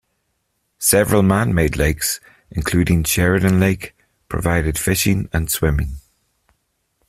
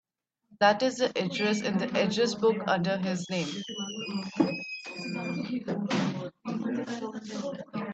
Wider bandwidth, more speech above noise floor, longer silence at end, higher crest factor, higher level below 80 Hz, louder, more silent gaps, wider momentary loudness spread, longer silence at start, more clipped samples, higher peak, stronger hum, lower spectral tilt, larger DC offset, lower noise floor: first, 16 kHz vs 8.6 kHz; first, 53 dB vs 39 dB; first, 1.1 s vs 0 s; about the same, 18 dB vs 20 dB; first, -32 dBFS vs -72 dBFS; first, -18 LUFS vs -30 LUFS; neither; about the same, 12 LU vs 11 LU; first, 0.8 s vs 0.5 s; neither; first, -2 dBFS vs -10 dBFS; neither; about the same, -5 dB/octave vs -5 dB/octave; neither; about the same, -70 dBFS vs -67 dBFS